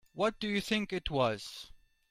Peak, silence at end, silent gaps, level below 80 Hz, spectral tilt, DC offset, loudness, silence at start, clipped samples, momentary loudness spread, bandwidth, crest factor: -16 dBFS; 0.35 s; none; -54 dBFS; -5 dB/octave; under 0.1%; -33 LUFS; 0.15 s; under 0.1%; 15 LU; 15 kHz; 18 dB